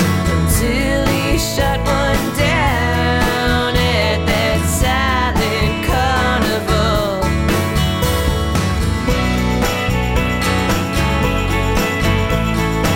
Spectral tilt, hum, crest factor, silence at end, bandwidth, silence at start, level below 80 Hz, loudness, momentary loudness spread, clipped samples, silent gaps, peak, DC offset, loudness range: -5 dB/octave; none; 14 dB; 0 s; 16.5 kHz; 0 s; -22 dBFS; -16 LUFS; 2 LU; under 0.1%; none; -2 dBFS; under 0.1%; 1 LU